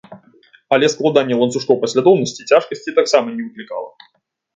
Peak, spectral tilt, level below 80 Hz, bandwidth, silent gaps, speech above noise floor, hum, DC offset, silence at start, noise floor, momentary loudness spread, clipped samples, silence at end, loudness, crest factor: 0 dBFS; -4.5 dB/octave; -64 dBFS; 9.2 kHz; none; 35 dB; none; under 0.1%; 0.1 s; -51 dBFS; 14 LU; under 0.1%; 0.7 s; -16 LUFS; 16 dB